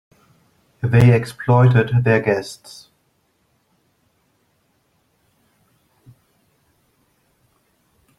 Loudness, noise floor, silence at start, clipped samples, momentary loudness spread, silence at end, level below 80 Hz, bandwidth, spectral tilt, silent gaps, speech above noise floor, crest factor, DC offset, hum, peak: -16 LUFS; -65 dBFS; 0.85 s; under 0.1%; 23 LU; 5.65 s; -50 dBFS; 12 kHz; -8 dB/octave; none; 49 dB; 20 dB; under 0.1%; none; -2 dBFS